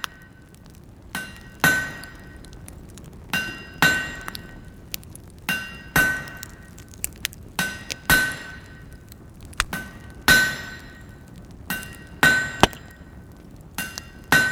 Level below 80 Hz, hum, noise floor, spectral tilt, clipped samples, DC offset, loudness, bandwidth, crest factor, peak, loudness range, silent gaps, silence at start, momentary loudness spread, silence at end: -44 dBFS; none; -46 dBFS; -2.5 dB/octave; under 0.1%; under 0.1%; -23 LUFS; over 20 kHz; 26 dB; 0 dBFS; 5 LU; none; 0 s; 25 LU; 0 s